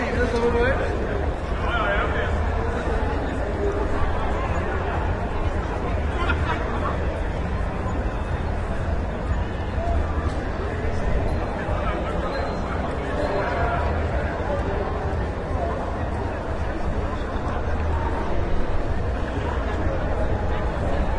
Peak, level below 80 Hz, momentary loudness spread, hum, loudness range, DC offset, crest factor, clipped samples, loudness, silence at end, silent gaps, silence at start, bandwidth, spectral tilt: -8 dBFS; -28 dBFS; 4 LU; none; 2 LU; under 0.1%; 16 dB; under 0.1%; -26 LUFS; 0 s; none; 0 s; 10.5 kHz; -7.5 dB/octave